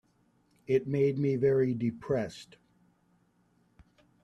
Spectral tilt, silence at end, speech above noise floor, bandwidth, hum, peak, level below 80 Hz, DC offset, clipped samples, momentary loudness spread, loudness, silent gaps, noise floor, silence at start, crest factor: -8.5 dB/octave; 1.8 s; 40 dB; 9.8 kHz; none; -16 dBFS; -66 dBFS; under 0.1%; under 0.1%; 13 LU; -30 LUFS; none; -69 dBFS; 0.7 s; 16 dB